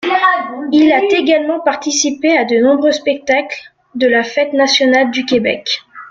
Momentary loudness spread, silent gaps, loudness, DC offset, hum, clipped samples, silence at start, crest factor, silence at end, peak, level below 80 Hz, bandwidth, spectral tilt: 8 LU; none; -13 LUFS; under 0.1%; none; under 0.1%; 0 s; 12 dB; 0.05 s; 0 dBFS; -58 dBFS; 7.8 kHz; -2.5 dB/octave